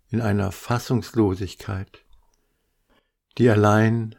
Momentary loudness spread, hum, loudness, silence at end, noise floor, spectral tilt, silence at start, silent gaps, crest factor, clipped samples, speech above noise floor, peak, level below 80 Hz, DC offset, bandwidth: 15 LU; none; -22 LUFS; 0.05 s; -70 dBFS; -7 dB/octave; 0.1 s; none; 18 dB; under 0.1%; 48 dB; -4 dBFS; -54 dBFS; under 0.1%; 16.5 kHz